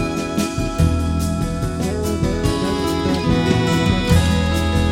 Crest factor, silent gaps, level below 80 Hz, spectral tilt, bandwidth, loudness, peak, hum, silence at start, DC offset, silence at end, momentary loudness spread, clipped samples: 16 dB; none; -26 dBFS; -6 dB/octave; 16.5 kHz; -19 LUFS; -2 dBFS; none; 0 s; under 0.1%; 0 s; 6 LU; under 0.1%